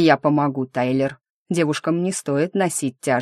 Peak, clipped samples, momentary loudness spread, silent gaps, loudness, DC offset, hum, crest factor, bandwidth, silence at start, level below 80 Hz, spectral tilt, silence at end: -2 dBFS; under 0.1%; 5 LU; 1.30-1.46 s; -21 LUFS; under 0.1%; none; 18 dB; 13 kHz; 0 s; -66 dBFS; -5.5 dB/octave; 0 s